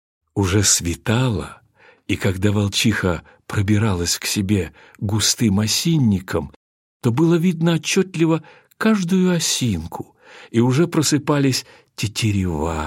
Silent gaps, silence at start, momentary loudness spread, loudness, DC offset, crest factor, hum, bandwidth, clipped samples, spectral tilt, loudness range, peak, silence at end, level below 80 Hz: 6.56-7.00 s; 0.35 s; 11 LU; -19 LUFS; under 0.1%; 16 dB; none; 16.5 kHz; under 0.1%; -4.5 dB/octave; 2 LU; -2 dBFS; 0 s; -44 dBFS